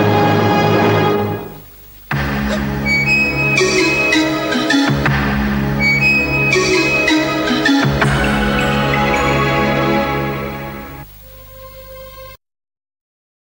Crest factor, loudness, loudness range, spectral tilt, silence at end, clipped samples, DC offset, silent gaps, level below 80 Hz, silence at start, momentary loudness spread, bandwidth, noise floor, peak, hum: 14 dB; -14 LUFS; 7 LU; -5 dB/octave; 1.25 s; under 0.1%; under 0.1%; none; -32 dBFS; 0 s; 19 LU; 16.5 kHz; -38 dBFS; -2 dBFS; none